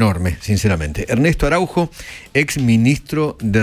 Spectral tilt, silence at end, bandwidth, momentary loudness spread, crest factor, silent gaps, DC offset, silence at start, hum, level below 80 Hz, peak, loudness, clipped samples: -6 dB/octave; 0 s; 16 kHz; 6 LU; 14 dB; none; under 0.1%; 0 s; none; -30 dBFS; -2 dBFS; -17 LUFS; under 0.1%